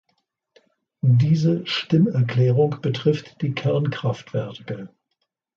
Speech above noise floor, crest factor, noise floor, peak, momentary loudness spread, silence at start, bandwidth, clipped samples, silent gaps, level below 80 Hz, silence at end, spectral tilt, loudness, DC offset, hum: 56 dB; 16 dB; -76 dBFS; -6 dBFS; 11 LU; 1.05 s; 7 kHz; under 0.1%; none; -60 dBFS; 0.7 s; -8 dB/octave; -21 LUFS; under 0.1%; none